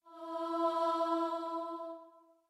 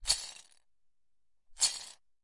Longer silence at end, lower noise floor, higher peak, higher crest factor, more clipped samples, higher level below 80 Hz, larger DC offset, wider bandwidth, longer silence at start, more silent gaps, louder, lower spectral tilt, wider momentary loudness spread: about the same, 0.3 s vs 0.3 s; second, -60 dBFS vs -85 dBFS; second, -22 dBFS vs -12 dBFS; second, 14 dB vs 26 dB; neither; second, under -90 dBFS vs -58 dBFS; neither; about the same, 12.5 kHz vs 11.5 kHz; about the same, 0.05 s vs 0 s; neither; second, -36 LUFS vs -32 LUFS; first, -3.5 dB/octave vs 2.5 dB/octave; second, 12 LU vs 20 LU